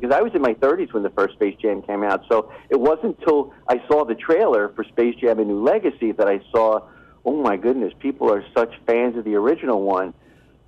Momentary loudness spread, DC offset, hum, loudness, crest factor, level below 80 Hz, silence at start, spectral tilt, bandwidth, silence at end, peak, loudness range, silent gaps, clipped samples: 5 LU; under 0.1%; none; -20 LUFS; 10 dB; -56 dBFS; 0 s; -7.5 dB/octave; 7.2 kHz; 0.55 s; -10 dBFS; 2 LU; none; under 0.1%